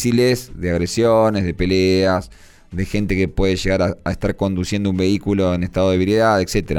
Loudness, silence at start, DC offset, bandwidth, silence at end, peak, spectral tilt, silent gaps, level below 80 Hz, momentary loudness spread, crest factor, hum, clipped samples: -18 LUFS; 0 s; under 0.1%; 18 kHz; 0 s; -4 dBFS; -6 dB/octave; none; -34 dBFS; 7 LU; 12 dB; none; under 0.1%